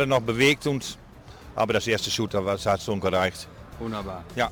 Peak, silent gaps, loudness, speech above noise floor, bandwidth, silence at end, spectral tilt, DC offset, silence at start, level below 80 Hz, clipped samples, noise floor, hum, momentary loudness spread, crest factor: -8 dBFS; none; -25 LUFS; 20 dB; over 20 kHz; 0 s; -4.5 dB/octave; under 0.1%; 0 s; -50 dBFS; under 0.1%; -45 dBFS; none; 16 LU; 18 dB